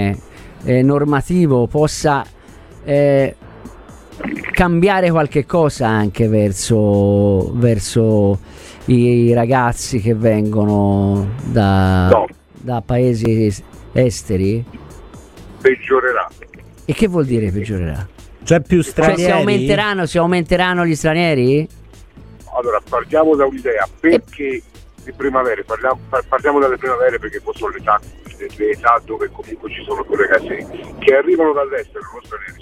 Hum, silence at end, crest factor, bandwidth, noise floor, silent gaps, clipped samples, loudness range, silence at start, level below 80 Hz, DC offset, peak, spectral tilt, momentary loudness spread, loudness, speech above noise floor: none; 0.1 s; 16 dB; 14.5 kHz; -39 dBFS; none; under 0.1%; 4 LU; 0 s; -38 dBFS; 0.1%; 0 dBFS; -6.5 dB/octave; 13 LU; -16 LUFS; 24 dB